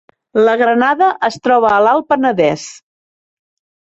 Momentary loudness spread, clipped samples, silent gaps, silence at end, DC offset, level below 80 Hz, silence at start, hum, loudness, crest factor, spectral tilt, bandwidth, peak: 7 LU; under 0.1%; none; 1.1 s; under 0.1%; -56 dBFS; 0.35 s; none; -13 LUFS; 14 dB; -5 dB/octave; 8.2 kHz; 0 dBFS